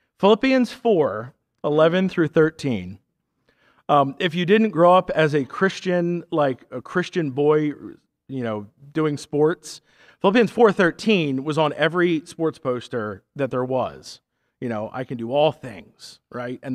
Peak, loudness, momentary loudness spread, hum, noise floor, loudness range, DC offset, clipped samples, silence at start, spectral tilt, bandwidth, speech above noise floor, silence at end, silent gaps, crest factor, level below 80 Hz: -4 dBFS; -21 LUFS; 16 LU; none; -68 dBFS; 6 LU; under 0.1%; under 0.1%; 0.2 s; -6.5 dB/octave; 12 kHz; 47 dB; 0 s; none; 18 dB; -62 dBFS